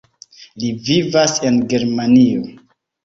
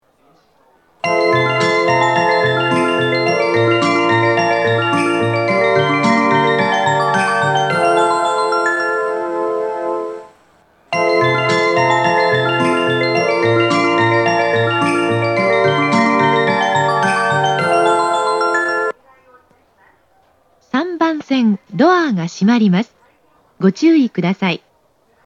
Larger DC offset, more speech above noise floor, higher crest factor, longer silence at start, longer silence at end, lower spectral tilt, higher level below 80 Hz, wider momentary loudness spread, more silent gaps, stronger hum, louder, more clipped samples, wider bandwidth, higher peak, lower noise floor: neither; second, 29 dB vs 43 dB; about the same, 16 dB vs 14 dB; second, 0.55 s vs 1.05 s; second, 0.55 s vs 0.7 s; about the same, -5 dB/octave vs -5.5 dB/octave; first, -52 dBFS vs -66 dBFS; first, 12 LU vs 6 LU; neither; neither; about the same, -15 LUFS vs -15 LUFS; neither; second, 7.6 kHz vs 11 kHz; about the same, 0 dBFS vs 0 dBFS; second, -44 dBFS vs -57 dBFS